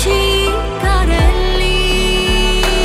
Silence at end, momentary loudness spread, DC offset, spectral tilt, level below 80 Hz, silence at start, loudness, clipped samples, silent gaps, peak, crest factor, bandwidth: 0 s; 3 LU; under 0.1%; -4 dB/octave; -16 dBFS; 0 s; -14 LUFS; under 0.1%; none; 0 dBFS; 12 dB; 15.5 kHz